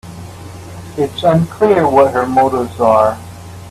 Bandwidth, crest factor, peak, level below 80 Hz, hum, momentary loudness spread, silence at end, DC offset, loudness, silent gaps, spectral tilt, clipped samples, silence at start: 14 kHz; 14 dB; 0 dBFS; -46 dBFS; none; 21 LU; 0 s; under 0.1%; -13 LUFS; none; -7 dB/octave; under 0.1%; 0.05 s